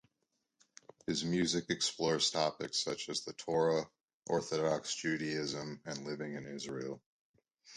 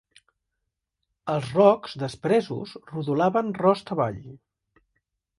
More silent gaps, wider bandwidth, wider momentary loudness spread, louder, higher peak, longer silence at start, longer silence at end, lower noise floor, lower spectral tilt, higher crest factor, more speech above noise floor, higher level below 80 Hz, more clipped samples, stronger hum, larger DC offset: first, 4.14-4.20 s, 7.06-7.34 s vs none; about the same, 11 kHz vs 11.5 kHz; second, 11 LU vs 15 LU; second, -36 LUFS vs -24 LUFS; second, -18 dBFS vs -4 dBFS; second, 1.1 s vs 1.25 s; second, 0 s vs 1.05 s; about the same, -84 dBFS vs -82 dBFS; second, -3.5 dB/octave vs -7.5 dB/octave; about the same, 20 dB vs 22 dB; second, 48 dB vs 58 dB; second, -72 dBFS vs -62 dBFS; neither; neither; neither